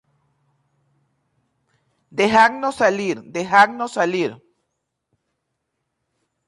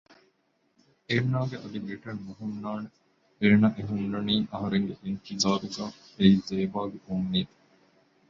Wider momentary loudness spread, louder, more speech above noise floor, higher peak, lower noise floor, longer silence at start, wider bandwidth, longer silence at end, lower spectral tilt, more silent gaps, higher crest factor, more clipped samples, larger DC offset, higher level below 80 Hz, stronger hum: second, 12 LU vs 15 LU; first, -18 LUFS vs -28 LUFS; first, 59 dB vs 44 dB; first, -2 dBFS vs -8 dBFS; first, -76 dBFS vs -71 dBFS; first, 2.15 s vs 1.1 s; first, 11.5 kHz vs 7.6 kHz; first, 2.1 s vs 0.85 s; second, -4 dB/octave vs -6 dB/octave; neither; about the same, 20 dB vs 22 dB; neither; neither; about the same, -62 dBFS vs -58 dBFS; neither